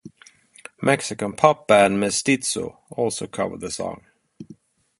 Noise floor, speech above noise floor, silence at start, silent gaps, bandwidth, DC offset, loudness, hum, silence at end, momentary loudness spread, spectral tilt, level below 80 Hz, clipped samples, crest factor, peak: -52 dBFS; 31 dB; 0.05 s; none; 11.5 kHz; under 0.1%; -21 LUFS; none; 0.45 s; 13 LU; -4 dB/octave; -58 dBFS; under 0.1%; 22 dB; -2 dBFS